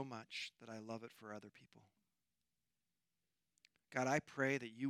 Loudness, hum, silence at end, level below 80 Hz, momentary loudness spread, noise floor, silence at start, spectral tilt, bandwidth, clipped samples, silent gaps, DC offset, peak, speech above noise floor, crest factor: -43 LUFS; none; 0 s; -88 dBFS; 15 LU; under -90 dBFS; 0 s; -4.5 dB/octave; 14.5 kHz; under 0.1%; none; under 0.1%; -22 dBFS; over 46 dB; 24 dB